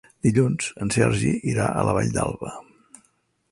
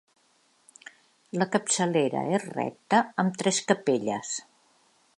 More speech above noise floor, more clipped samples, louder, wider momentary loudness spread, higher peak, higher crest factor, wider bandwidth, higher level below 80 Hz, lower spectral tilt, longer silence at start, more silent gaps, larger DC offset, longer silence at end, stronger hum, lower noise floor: first, 44 dB vs 40 dB; neither; first, -23 LUFS vs -27 LUFS; about the same, 11 LU vs 10 LU; about the same, -6 dBFS vs -6 dBFS; about the same, 18 dB vs 22 dB; about the same, 11.5 kHz vs 11.5 kHz; first, -46 dBFS vs -78 dBFS; first, -6 dB/octave vs -4 dB/octave; second, 0.25 s vs 1.35 s; neither; neither; first, 0.9 s vs 0.75 s; neither; about the same, -67 dBFS vs -66 dBFS